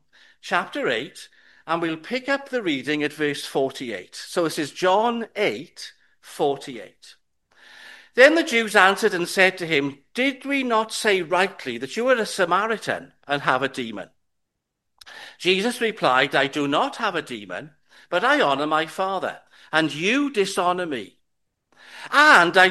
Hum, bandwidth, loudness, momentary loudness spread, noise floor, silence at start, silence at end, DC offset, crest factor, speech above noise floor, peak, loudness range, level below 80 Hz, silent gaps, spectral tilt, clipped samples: none; 12.5 kHz; -21 LUFS; 16 LU; -78 dBFS; 0.45 s; 0 s; under 0.1%; 22 dB; 56 dB; 0 dBFS; 7 LU; -70 dBFS; none; -3.5 dB/octave; under 0.1%